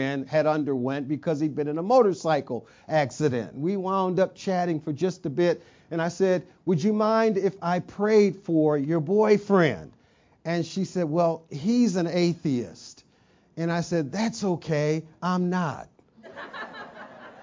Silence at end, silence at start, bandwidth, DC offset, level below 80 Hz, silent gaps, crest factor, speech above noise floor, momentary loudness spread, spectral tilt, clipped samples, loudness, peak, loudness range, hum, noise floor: 0 s; 0 s; 7.6 kHz; under 0.1%; -66 dBFS; none; 18 dB; 37 dB; 16 LU; -6.5 dB/octave; under 0.1%; -25 LUFS; -8 dBFS; 5 LU; none; -61 dBFS